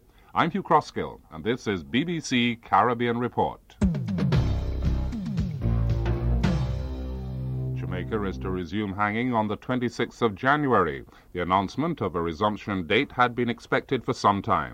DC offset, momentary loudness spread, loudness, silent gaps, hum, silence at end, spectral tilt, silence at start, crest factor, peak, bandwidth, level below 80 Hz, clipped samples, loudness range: under 0.1%; 9 LU; -26 LUFS; none; none; 0 s; -6.5 dB/octave; 0.35 s; 20 dB; -6 dBFS; 9.8 kHz; -36 dBFS; under 0.1%; 3 LU